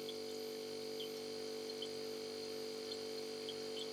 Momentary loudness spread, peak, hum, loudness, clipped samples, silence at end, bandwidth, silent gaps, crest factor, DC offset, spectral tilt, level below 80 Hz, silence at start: 1 LU; -32 dBFS; none; -45 LUFS; under 0.1%; 0 s; 18.5 kHz; none; 14 dB; under 0.1%; -2.5 dB/octave; -90 dBFS; 0 s